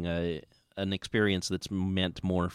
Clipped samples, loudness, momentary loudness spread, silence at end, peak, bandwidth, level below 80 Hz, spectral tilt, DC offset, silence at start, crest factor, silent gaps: under 0.1%; -31 LUFS; 9 LU; 0 s; -14 dBFS; 13.5 kHz; -54 dBFS; -5.5 dB/octave; under 0.1%; 0 s; 16 dB; none